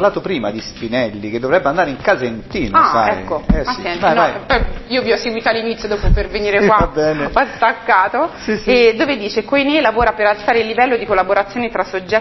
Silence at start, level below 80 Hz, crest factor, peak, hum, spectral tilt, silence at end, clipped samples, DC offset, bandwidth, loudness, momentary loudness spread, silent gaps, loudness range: 0 s; -28 dBFS; 14 dB; 0 dBFS; none; -6 dB/octave; 0 s; under 0.1%; under 0.1%; 6.2 kHz; -15 LUFS; 8 LU; none; 2 LU